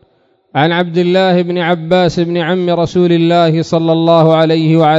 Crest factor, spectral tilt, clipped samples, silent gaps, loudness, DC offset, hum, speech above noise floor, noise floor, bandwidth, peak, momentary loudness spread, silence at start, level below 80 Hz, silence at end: 10 dB; -7.5 dB/octave; 0.3%; none; -11 LUFS; under 0.1%; none; 44 dB; -54 dBFS; 7.8 kHz; 0 dBFS; 5 LU; 0.55 s; -48 dBFS; 0 s